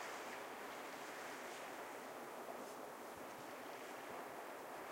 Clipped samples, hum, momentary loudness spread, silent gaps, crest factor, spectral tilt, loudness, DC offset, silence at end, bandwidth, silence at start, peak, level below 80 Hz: under 0.1%; none; 2 LU; none; 14 dB; -2.5 dB/octave; -51 LUFS; under 0.1%; 0 s; 16 kHz; 0 s; -36 dBFS; -88 dBFS